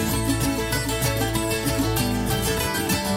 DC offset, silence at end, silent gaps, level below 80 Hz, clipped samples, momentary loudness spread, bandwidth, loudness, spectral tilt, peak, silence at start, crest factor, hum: under 0.1%; 0 s; none; -34 dBFS; under 0.1%; 1 LU; 16.5 kHz; -23 LUFS; -4 dB/octave; -8 dBFS; 0 s; 14 dB; none